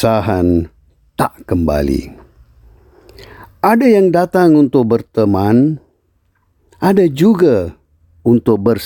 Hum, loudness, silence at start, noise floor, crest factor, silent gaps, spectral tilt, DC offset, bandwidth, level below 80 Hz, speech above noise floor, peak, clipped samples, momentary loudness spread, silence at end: none; -13 LUFS; 0 s; -59 dBFS; 12 dB; none; -8 dB/octave; under 0.1%; 17.5 kHz; -36 dBFS; 48 dB; -2 dBFS; under 0.1%; 10 LU; 0 s